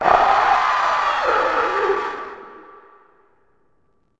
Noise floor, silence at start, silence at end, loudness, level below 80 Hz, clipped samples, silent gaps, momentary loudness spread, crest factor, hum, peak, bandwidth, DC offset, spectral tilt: -65 dBFS; 0 s; 1.6 s; -18 LUFS; -50 dBFS; under 0.1%; none; 16 LU; 20 dB; none; 0 dBFS; 8.6 kHz; under 0.1%; -3 dB/octave